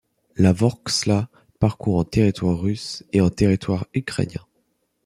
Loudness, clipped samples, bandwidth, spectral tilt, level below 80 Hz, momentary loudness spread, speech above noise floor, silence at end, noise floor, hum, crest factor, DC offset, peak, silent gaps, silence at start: -21 LUFS; under 0.1%; 13 kHz; -6 dB/octave; -44 dBFS; 10 LU; 49 dB; 0.65 s; -69 dBFS; none; 18 dB; under 0.1%; -4 dBFS; none; 0.35 s